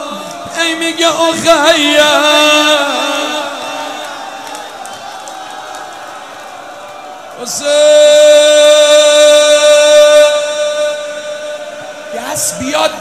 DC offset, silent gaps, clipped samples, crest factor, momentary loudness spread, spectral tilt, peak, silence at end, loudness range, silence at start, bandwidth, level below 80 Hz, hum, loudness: 0.3%; none; 0.4%; 10 dB; 21 LU; -1 dB/octave; 0 dBFS; 0 s; 18 LU; 0 s; 15.5 kHz; -54 dBFS; none; -8 LUFS